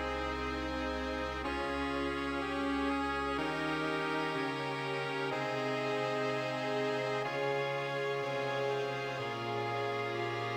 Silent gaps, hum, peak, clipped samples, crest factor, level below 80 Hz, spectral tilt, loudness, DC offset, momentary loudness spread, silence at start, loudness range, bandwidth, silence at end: none; none; -22 dBFS; under 0.1%; 14 dB; -52 dBFS; -5.5 dB/octave; -35 LUFS; under 0.1%; 3 LU; 0 s; 1 LU; 17 kHz; 0 s